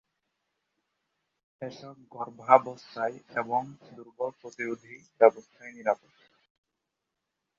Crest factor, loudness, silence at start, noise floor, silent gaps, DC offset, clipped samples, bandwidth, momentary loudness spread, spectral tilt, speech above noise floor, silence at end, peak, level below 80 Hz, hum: 28 dB; -28 LUFS; 1.6 s; -85 dBFS; none; under 0.1%; under 0.1%; 7.4 kHz; 24 LU; -4 dB/octave; 56 dB; 1.65 s; -4 dBFS; -82 dBFS; none